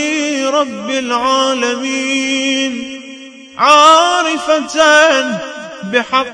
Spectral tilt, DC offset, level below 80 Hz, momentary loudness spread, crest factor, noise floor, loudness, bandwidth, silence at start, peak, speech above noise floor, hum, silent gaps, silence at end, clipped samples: -1.5 dB/octave; under 0.1%; -56 dBFS; 19 LU; 14 dB; -33 dBFS; -12 LUFS; 11 kHz; 0 s; 0 dBFS; 21 dB; none; none; 0 s; 0.4%